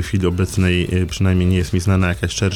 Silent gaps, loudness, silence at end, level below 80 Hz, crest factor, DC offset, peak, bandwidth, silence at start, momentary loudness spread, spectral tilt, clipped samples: none; -18 LUFS; 0 s; -32 dBFS; 12 dB; under 0.1%; -6 dBFS; 13.5 kHz; 0 s; 2 LU; -6 dB/octave; under 0.1%